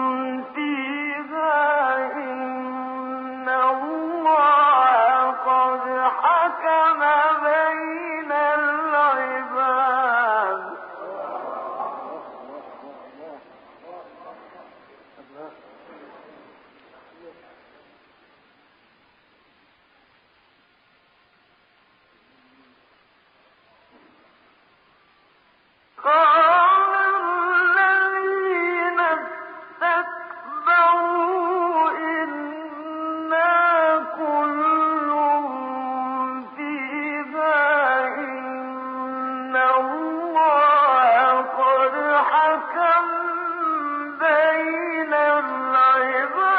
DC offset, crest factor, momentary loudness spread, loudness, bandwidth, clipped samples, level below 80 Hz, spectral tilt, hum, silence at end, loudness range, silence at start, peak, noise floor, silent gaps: under 0.1%; 14 dB; 15 LU; -20 LUFS; 5 kHz; under 0.1%; -76 dBFS; 0.5 dB/octave; none; 0 s; 6 LU; 0 s; -8 dBFS; -60 dBFS; none